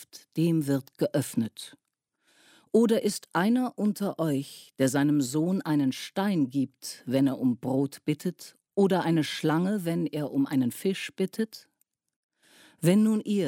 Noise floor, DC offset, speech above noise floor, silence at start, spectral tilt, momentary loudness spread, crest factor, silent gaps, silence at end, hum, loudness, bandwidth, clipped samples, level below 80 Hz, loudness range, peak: -72 dBFS; under 0.1%; 45 dB; 0 s; -6 dB/octave; 10 LU; 16 dB; 12.16-12.29 s; 0 s; none; -27 LUFS; 16.5 kHz; under 0.1%; -76 dBFS; 2 LU; -10 dBFS